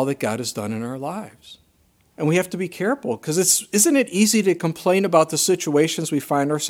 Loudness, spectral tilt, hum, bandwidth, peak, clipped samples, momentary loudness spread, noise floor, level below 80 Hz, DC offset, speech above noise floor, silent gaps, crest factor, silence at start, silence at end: -20 LUFS; -4 dB/octave; none; 17.5 kHz; -2 dBFS; under 0.1%; 11 LU; -60 dBFS; -68 dBFS; under 0.1%; 40 dB; none; 20 dB; 0 s; 0 s